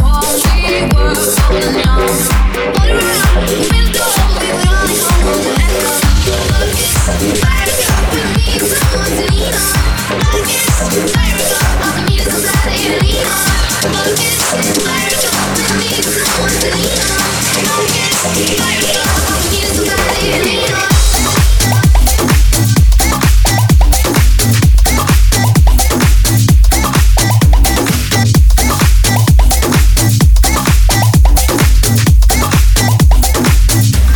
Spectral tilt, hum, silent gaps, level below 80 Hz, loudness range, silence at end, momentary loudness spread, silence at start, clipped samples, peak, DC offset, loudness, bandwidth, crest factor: -4 dB/octave; none; none; -12 dBFS; 2 LU; 0 s; 3 LU; 0 s; under 0.1%; 0 dBFS; under 0.1%; -11 LUFS; 20 kHz; 10 dB